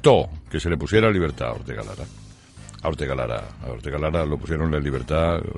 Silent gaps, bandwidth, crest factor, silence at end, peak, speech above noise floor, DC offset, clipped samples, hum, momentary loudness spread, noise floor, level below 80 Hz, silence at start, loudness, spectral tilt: none; 11.5 kHz; 20 dB; 0 s; -2 dBFS; 21 dB; under 0.1%; under 0.1%; none; 16 LU; -43 dBFS; -36 dBFS; 0 s; -24 LUFS; -6.5 dB/octave